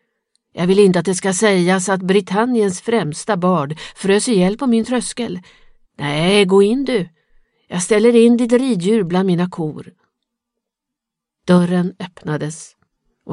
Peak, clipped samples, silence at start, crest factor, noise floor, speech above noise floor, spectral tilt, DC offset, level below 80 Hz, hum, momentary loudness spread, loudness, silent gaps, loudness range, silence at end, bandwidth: 0 dBFS; under 0.1%; 0.55 s; 16 dB; -82 dBFS; 67 dB; -5.5 dB/octave; under 0.1%; -52 dBFS; none; 14 LU; -16 LUFS; none; 6 LU; 0 s; 11.5 kHz